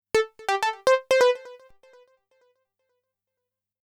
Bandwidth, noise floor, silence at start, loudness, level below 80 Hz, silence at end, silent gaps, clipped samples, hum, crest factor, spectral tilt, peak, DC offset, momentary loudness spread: 15 kHz; -86 dBFS; 0.15 s; -23 LUFS; -64 dBFS; 2.25 s; none; under 0.1%; 50 Hz at -80 dBFS; 18 dB; -1.5 dB/octave; -8 dBFS; under 0.1%; 7 LU